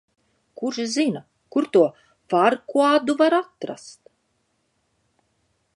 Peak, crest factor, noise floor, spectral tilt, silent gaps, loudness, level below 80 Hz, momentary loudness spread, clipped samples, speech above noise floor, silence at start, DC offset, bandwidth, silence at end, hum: -4 dBFS; 18 dB; -70 dBFS; -4.5 dB/octave; none; -21 LUFS; -76 dBFS; 15 LU; under 0.1%; 50 dB; 0.6 s; under 0.1%; 11 kHz; 1.85 s; none